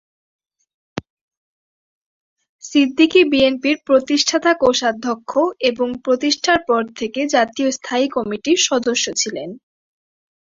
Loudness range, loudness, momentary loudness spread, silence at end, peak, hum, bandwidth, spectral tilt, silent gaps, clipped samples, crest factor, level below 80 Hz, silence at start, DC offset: 3 LU; -17 LUFS; 10 LU; 0.95 s; -2 dBFS; none; 7.8 kHz; -2 dB/octave; 1.10-1.31 s, 1.37-2.36 s, 2.49-2.59 s; under 0.1%; 18 dB; -56 dBFS; 0.95 s; under 0.1%